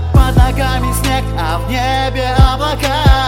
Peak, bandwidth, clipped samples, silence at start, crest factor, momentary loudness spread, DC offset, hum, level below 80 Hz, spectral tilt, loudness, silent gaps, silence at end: 0 dBFS; 17 kHz; 0.8%; 0 s; 12 dB; 5 LU; under 0.1%; none; -16 dBFS; -5.5 dB/octave; -14 LUFS; none; 0 s